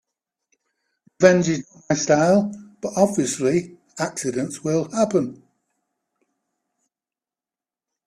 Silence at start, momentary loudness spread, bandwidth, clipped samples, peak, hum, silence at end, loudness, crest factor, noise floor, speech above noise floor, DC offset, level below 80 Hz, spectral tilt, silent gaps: 1.2 s; 12 LU; 13.5 kHz; under 0.1%; 0 dBFS; none; 2.75 s; -21 LUFS; 22 dB; under -90 dBFS; over 70 dB; under 0.1%; -62 dBFS; -5 dB/octave; none